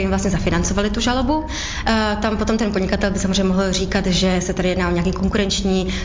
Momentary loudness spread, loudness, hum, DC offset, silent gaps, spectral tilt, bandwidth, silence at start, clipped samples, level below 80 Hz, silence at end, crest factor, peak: 2 LU; -19 LUFS; none; under 0.1%; none; -5 dB/octave; 7.6 kHz; 0 s; under 0.1%; -28 dBFS; 0 s; 14 dB; -6 dBFS